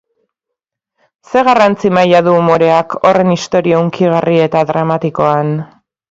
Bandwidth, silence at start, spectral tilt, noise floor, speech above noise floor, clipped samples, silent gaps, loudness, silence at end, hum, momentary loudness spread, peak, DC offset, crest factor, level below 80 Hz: 7.8 kHz; 1.3 s; -6.5 dB/octave; -79 dBFS; 68 dB; under 0.1%; none; -11 LUFS; 0.45 s; none; 6 LU; 0 dBFS; under 0.1%; 12 dB; -52 dBFS